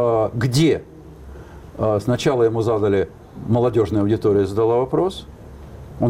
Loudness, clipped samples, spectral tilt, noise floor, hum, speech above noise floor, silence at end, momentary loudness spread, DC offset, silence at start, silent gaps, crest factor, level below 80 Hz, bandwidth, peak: -19 LUFS; under 0.1%; -7 dB/octave; -38 dBFS; none; 20 dB; 0 s; 22 LU; under 0.1%; 0 s; none; 12 dB; -44 dBFS; 16 kHz; -8 dBFS